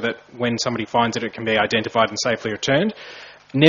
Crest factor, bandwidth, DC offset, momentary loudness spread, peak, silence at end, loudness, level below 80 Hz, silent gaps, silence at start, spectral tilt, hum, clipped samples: 20 dB; 7.6 kHz; under 0.1%; 9 LU; 0 dBFS; 0 s; -21 LUFS; -56 dBFS; none; 0 s; -3.5 dB/octave; none; under 0.1%